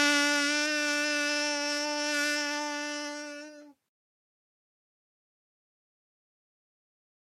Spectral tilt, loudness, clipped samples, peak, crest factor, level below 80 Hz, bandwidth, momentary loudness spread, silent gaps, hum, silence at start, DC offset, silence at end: 1.5 dB/octave; -28 LUFS; under 0.1%; -14 dBFS; 20 dB; -90 dBFS; 15.5 kHz; 14 LU; none; none; 0 s; under 0.1%; 3.5 s